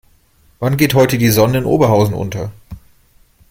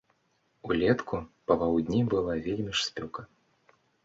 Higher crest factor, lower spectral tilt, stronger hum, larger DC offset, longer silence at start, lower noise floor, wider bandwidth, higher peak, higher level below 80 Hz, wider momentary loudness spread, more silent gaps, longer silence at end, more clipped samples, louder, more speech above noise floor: second, 14 dB vs 20 dB; about the same, -6 dB/octave vs -5.5 dB/octave; neither; neither; about the same, 0.6 s vs 0.65 s; second, -52 dBFS vs -72 dBFS; first, 16.5 kHz vs 7.8 kHz; first, 0 dBFS vs -10 dBFS; first, -40 dBFS vs -54 dBFS; about the same, 11 LU vs 13 LU; neither; about the same, 0.75 s vs 0.8 s; neither; first, -14 LUFS vs -29 LUFS; second, 39 dB vs 44 dB